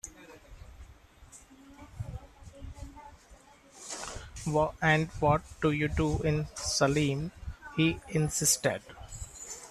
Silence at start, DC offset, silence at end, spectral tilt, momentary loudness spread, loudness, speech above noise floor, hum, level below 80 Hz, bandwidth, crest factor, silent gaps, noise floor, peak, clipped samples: 0.05 s; under 0.1%; 0 s; -4.5 dB/octave; 21 LU; -29 LUFS; 28 dB; none; -48 dBFS; 13.5 kHz; 22 dB; none; -56 dBFS; -12 dBFS; under 0.1%